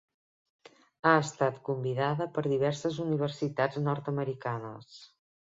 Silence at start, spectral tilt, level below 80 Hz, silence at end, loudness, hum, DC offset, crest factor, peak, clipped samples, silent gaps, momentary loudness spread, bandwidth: 1.05 s; -6.5 dB/octave; -70 dBFS; 0.35 s; -30 LUFS; none; under 0.1%; 24 dB; -8 dBFS; under 0.1%; none; 11 LU; 7.8 kHz